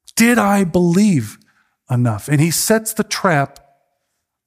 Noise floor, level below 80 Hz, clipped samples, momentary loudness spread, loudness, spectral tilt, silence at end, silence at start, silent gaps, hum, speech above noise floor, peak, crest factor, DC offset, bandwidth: -73 dBFS; -52 dBFS; under 0.1%; 7 LU; -16 LUFS; -5 dB/octave; 1 s; 0.15 s; none; none; 58 dB; 0 dBFS; 16 dB; under 0.1%; 16 kHz